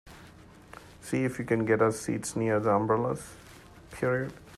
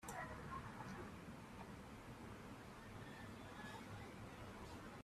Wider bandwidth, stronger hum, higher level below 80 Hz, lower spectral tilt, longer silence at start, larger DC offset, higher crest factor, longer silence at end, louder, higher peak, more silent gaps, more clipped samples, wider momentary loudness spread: about the same, 14 kHz vs 15 kHz; neither; first, -58 dBFS vs -66 dBFS; about the same, -6 dB/octave vs -5 dB/octave; about the same, 0.05 s vs 0 s; neither; about the same, 20 dB vs 16 dB; about the same, 0 s vs 0 s; first, -29 LUFS vs -54 LUFS; first, -10 dBFS vs -38 dBFS; neither; neither; first, 23 LU vs 5 LU